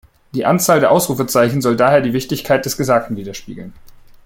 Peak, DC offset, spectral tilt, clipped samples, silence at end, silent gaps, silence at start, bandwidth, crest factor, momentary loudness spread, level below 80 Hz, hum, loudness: -2 dBFS; under 0.1%; -5 dB/octave; under 0.1%; 0.35 s; none; 0.35 s; 17 kHz; 14 dB; 16 LU; -48 dBFS; none; -15 LUFS